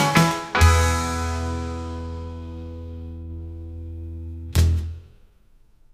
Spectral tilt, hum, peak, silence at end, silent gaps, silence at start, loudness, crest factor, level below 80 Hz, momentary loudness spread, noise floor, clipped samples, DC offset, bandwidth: -5 dB/octave; none; -2 dBFS; 0.85 s; none; 0 s; -22 LUFS; 20 dB; -30 dBFS; 18 LU; -54 dBFS; under 0.1%; under 0.1%; 15.5 kHz